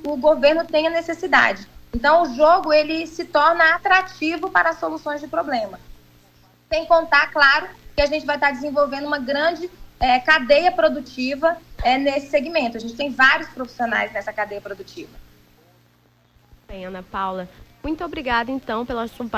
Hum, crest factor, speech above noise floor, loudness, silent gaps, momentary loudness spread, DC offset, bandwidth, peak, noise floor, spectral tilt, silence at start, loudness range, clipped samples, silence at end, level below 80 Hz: 60 Hz at -50 dBFS; 18 dB; 38 dB; -19 LUFS; none; 16 LU; under 0.1%; 15.5 kHz; -4 dBFS; -58 dBFS; -4 dB/octave; 0 s; 11 LU; under 0.1%; 0 s; -44 dBFS